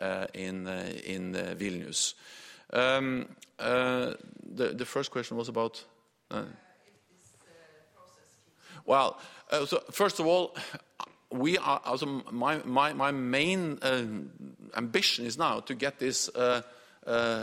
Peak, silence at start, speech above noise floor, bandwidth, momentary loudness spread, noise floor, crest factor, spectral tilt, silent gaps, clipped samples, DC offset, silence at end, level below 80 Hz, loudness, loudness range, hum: -10 dBFS; 0 s; 33 dB; 16 kHz; 16 LU; -64 dBFS; 22 dB; -3.5 dB/octave; none; under 0.1%; under 0.1%; 0 s; -72 dBFS; -30 LUFS; 7 LU; none